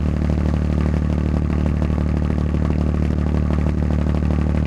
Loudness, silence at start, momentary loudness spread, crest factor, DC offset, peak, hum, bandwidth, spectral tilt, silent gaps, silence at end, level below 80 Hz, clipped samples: -20 LUFS; 0 s; 1 LU; 14 dB; under 0.1%; -4 dBFS; none; 7.2 kHz; -9 dB/octave; none; 0 s; -24 dBFS; under 0.1%